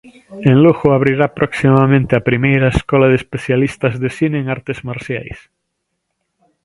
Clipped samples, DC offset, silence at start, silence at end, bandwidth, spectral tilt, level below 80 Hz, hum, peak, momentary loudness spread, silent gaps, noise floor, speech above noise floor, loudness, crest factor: under 0.1%; under 0.1%; 0.05 s; 1.25 s; 11.5 kHz; -8 dB/octave; -38 dBFS; none; 0 dBFS; 13 LU; none; -72 dBFS; 59 dB; -14 LUFS; 14 dB